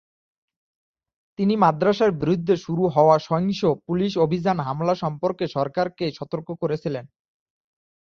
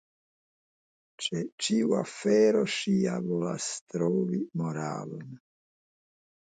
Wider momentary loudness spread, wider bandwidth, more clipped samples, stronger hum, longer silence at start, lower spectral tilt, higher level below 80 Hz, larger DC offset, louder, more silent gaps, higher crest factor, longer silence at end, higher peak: about the same, 10 LU vs 12 LU; second, 6.8 kHz vs 9.4 kHz; neither; neither; first, 1.4 s vs 1.2 s; first, -7.5 dB/octave vs -5 dB/octave; first, -58 dBFS vs -74 dBFS; neither; first, -22 LUFS vs -29 LUFS; second, none vs 1.52-1.58 s, 3.81-3.87 s; about the same, 20 dB vs 16 dB; second, 0.95 s vs 1.1 s; first, -4 dBFS vs -14 dBFS